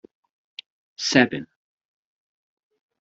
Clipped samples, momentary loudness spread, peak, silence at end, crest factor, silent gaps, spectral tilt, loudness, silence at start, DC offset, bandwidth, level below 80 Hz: under 0.1%; 23 LU; -2 dBFS; 1.55 s; 26 dB; none; -3.5 dB/octave; -21 LUFS; 1 s; under 0.1%; 8 kHz; -66 dBFS